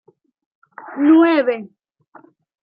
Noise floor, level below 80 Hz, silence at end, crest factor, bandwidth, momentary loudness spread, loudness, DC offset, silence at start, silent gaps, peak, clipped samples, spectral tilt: -49 dBFS; -76 dBFS; 0.95 s; 16 dB; 4.9 kHz; 17 LU; -15 LUFS; under 0.1%; 0.85 s; none; -4 dBFS; under 0.1%; -8.5 dB/octave